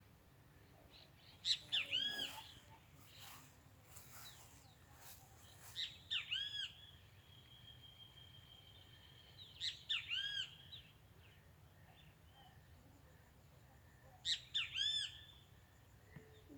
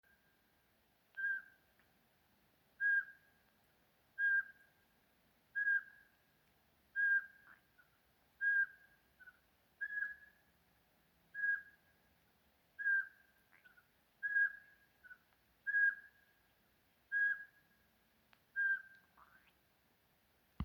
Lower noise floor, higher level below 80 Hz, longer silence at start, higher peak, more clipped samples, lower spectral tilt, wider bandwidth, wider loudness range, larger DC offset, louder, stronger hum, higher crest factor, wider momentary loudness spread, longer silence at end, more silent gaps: second, -66 dBFS vs -76 dBFS; first, -74 dBFS vs -86 dBFS; second, 0 s vs 1.15 s; about the same, -24 dBFS vs -26 dBFS; neither; second, -1 dB/octave vs -4.5 dB/octave; about the same, over 20 kHz vs over 20 kHz; first, 13 LU vs 4 LU; neither; second, -42 LUFS vs -37 LUFS; neither; first, 26 dB vs 18 dB; first, 26 LU vs 18 LU; about the same, 0 s vs 0 s; neither